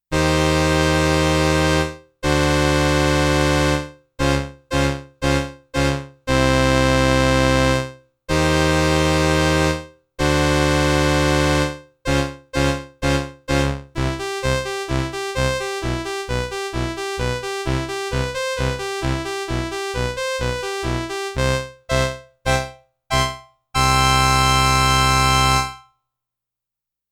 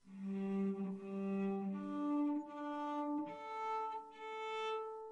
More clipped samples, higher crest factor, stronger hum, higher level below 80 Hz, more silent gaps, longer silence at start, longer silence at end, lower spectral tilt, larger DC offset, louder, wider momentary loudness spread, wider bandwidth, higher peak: neither; first, 16 dB vs 10 dB; neither; first, -30 dBFS vs -84 dBFS; neither; about the same, 0.1 s vs 0.05 s; first, 1.3 s vs 0 s; second, -4.5 dB/octave vs -7.5 dB/octave; neither; first, -19 LUFS vs -42 LUFS; first, 10 LU vs 7 LU; first, 18 kHz vs 8.8 kHz; first, -4 dBFS vs -30 dBFS